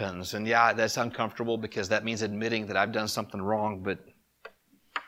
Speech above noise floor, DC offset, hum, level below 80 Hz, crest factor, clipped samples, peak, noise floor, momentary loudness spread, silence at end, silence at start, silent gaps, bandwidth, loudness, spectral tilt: 27 dB; under 0.1%; none; -66 dBFS; 22 dB; under 0.1%; -8 dBFS; -56 dBFS; 10 LU; 0 s; 0 s; none; 16.5 kHz; -29 LUFS; -4 dB/octave